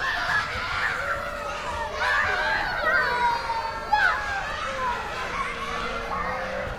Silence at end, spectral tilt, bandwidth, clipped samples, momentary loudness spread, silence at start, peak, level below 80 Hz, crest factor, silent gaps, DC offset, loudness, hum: 0 s; -3 dB/octave; 16.5 kHz; under 0.1%; 8 LU; 0 s; -10 dBFS; -44 dBFS; 16 dB; none; under 0.1%; -25 LUFS; none